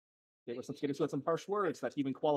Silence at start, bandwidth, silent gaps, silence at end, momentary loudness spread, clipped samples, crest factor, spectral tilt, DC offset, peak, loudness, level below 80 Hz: 0.45 s; 13.5 kHz; none; 0 s; 11 LU; under 0.1%; 16 dB; -6.5 dB/octave; under 0.1%; -20 dBFS; -37 LUFS; -86 dBFS